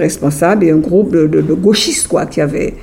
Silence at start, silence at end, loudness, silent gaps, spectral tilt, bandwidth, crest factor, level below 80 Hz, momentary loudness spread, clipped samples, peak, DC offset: 0 s; 0 s; -12 LUFS; none; -5 dB/octave; 16.5 kHz; 12 dB; -38 dBFS; 5 LU; under 0.1%; 0 dBFS; under 0.1%